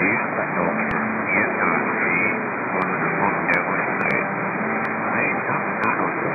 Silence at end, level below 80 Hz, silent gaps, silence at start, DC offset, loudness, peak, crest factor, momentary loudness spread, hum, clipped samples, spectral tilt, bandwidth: 0 s; -58 dBFS; none; 0 s; under 0.1%; -21 LUFS; -6 dBFS; 16 dB; 4 LU; none; under 0.1%; -9 dB/octave; 6.4 kHz